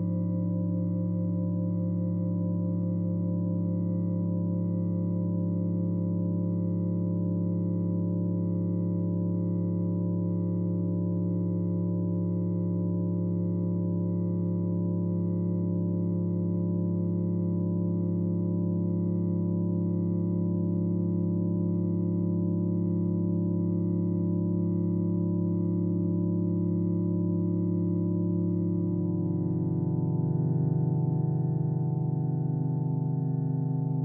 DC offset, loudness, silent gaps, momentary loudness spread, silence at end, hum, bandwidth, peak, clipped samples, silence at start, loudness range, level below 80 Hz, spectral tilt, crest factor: under 0.1%; -29 LUFS; none; 1 LU; 0 s; none; 1.2 kHz; -16 dBFS; under 0.1%; 0 s; 1 LU; -68 dBFS; -17 dB/octave; 10 dB